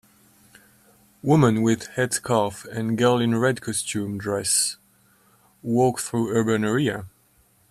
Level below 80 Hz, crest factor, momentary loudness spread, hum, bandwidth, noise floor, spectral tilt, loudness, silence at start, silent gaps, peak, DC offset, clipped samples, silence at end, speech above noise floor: -60 dBFS; 18 dB; 9 LU; none; 15.5 kHz; -60 dBFS; -4.5 dB/octave; -22 LUFS; 1.25 s; none; -6 dBFS; under 0.1%; under 0.1%; 0.65 s; 39 dB